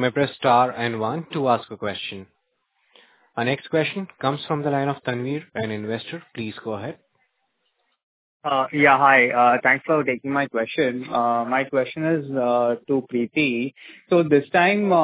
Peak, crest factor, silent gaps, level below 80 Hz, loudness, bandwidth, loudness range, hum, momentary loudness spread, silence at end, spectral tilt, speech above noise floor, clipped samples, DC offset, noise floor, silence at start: -2 dBFS; 20 dB; 8.03-8.40 s; -66 dBFS; -21 LUFS; 4 kHz; 10 LU; none; 14 LU; 0 s; -9.5 dB/octave; 51 dB; under 0.1%; under 0.1%; -72 dBFS; 0 s